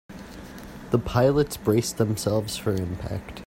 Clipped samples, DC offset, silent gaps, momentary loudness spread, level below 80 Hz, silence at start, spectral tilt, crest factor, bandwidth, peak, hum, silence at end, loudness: under 0.1%; under 0.1%; none; 20 LU; -46 dBFS; 0.1 s; -6 dB/octave; 18 dB; 16.5 kHz; -6 dBFS; none; 0.05 s; -25 LUFS